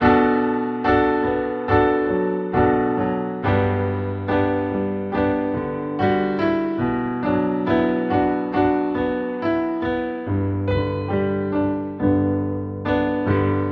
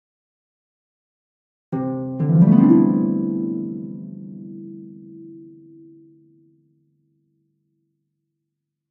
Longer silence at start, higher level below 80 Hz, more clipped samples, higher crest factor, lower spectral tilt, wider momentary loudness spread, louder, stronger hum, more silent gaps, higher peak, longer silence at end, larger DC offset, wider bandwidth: second, 0 s vs 1.7 s; first, -42 dBFS vs -64 dBFS; neither; second, 16 dB vs 22 dB; second, -10 dB/octave vs -13.5 dB/octave; second, 6 LU vs 27 LU; second, -21 LUFS vs -18 LUFS; neither; neither; about the same, -4 dBFS vs -2 dBFS; second, 0 s vs 3.45 s; neither; first, 5.8 kHz vs 3 kHz